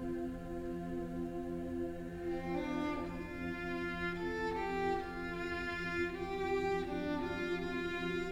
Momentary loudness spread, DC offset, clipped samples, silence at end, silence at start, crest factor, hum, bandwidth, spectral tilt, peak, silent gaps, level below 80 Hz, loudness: 5 LU; under 0.1%; under 0.1%; 0 s; 0 s; 14 dB; none; 16 kHz; -6.5 dB/octave; -24 dBFS; none; -52 dBFS; -39 LUFS